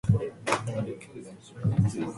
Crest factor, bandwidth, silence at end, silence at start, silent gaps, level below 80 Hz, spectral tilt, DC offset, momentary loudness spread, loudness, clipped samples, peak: 20 dB; 11.5 kHz; 0 s; 0.05 s; none; -48 dBFS; -6.5 dB/octave; under 0.1%; 18 LU; -29 LUFS; under 0.1%; -10 dBFS